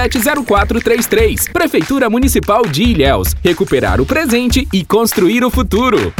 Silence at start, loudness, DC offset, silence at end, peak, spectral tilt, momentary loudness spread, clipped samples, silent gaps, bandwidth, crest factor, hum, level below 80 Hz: 0 s; -12 LUFS; under 0.1%; 0.05 s; 0 dBFS; -4.5 dB/octave; 2 LU; under 0.1%; none; over 20 kHz; 12 dB; none; -22 dBFS